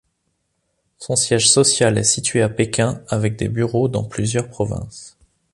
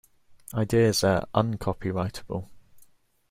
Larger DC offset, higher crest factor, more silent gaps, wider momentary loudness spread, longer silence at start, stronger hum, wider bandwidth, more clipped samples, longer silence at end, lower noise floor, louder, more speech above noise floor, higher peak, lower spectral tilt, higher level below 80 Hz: neither; about the same, 18 dB vs 20 dB; neither; about the same, 12 LU vs 14 LU; first, 1 s vs 0.3 s; neither; second, 11.5 kHz vs 16 kHz; neither; about the same, 0.45 s vs 0.5 s; first, -71 dBFS vs -58 dBFS; first, -18 LUFS vs -26 LUFS; first, 52 dB vs 33 dB; first, -2 dBFS vs -6 dBFS; second, -3.5 dB/octave vs -5.5 dB/octave; about the same, -46 dBFS vs -50 dBFS